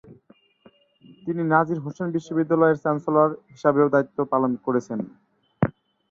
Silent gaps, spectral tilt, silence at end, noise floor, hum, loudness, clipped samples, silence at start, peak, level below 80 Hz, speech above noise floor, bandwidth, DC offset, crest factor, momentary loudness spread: none; -9 dB/octave; 0.4 s; -57 dBFS; none; -23 LUFS; under 0.1%; 0.1 s; -4 dBFS; -60 dBFS; 35 dB; 7.4 kHz; under 0.1%; 20 dB; 10 LU